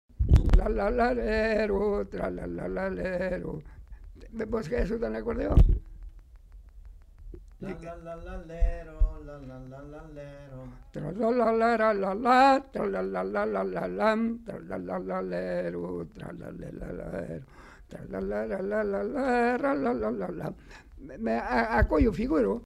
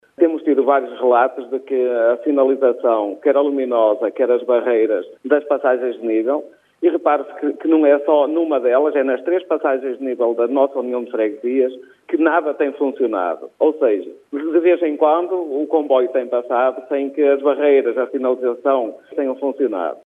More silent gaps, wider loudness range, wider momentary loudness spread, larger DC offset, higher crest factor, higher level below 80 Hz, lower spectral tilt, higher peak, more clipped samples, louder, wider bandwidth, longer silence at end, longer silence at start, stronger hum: neither; first, 12 LU vs 2 LU; first, 20 LU vs 7 LU; neither; first, 22 dB vs 16 dB; first, -34 dBFS vs -84 dBFS; first, -8 dB/octave vs -6.5 dB/octave; second, -6 dBFS vs -2 dBFS; neither; second, -28 LUFS vs -18 LUFS; first, 10.5 kHz vs 3.8 kHz; about the same, 0 s vs 0.1 s; about the same, 0.2 s vs 0.2 s; neither